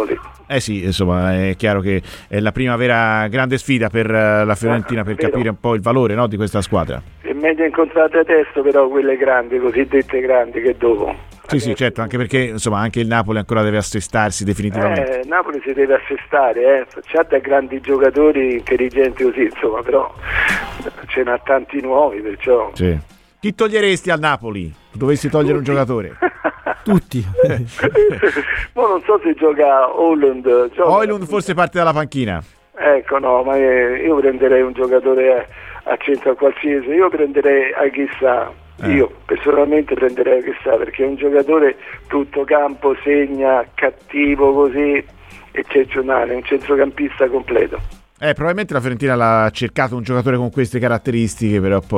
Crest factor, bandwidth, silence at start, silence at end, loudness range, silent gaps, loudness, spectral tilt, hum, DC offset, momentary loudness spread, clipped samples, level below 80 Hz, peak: 14 dB; 13.5 kHz; 0 s; 0 s; 3 LU; none; -16 LUFS; -6 dB/octave; none; under 0.1%; 7 LU; under 0.1%; -40 dBFS; -2 dBFS